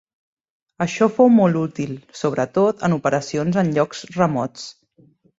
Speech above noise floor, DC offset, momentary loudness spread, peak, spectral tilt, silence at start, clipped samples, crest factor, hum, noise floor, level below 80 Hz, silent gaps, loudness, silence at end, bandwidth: 37 dB; under 0.1%; 15 LU; -2 dBFS; -6.5 dB/octave; 0.8 s; under 0.1%; 18 dB; none; -55 dBFS; -60 dBFS; none; -19 LUFS; 0.7 s; 7.8 kHz